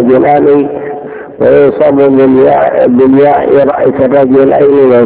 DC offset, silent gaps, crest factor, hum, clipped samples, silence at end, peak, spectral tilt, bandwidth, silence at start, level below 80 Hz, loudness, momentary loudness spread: under 0.1%; none; 6 dB; none; 7%; 0 s; 0 dBFS; -11.5 dB/octave; 4 kHz; 0 s; -42 dBFS; -6 LUFS; 8 LU